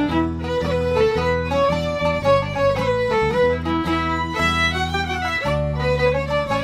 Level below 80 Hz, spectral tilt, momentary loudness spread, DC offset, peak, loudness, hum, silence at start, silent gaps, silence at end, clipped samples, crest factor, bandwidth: -34 dBFS; -6 dB/octave; 4 LU; under 0.1%; -6 dBFS; -20 LUFS; none; 0 s; none; 0 s; under 0.1%; 14 dB; 15 kHz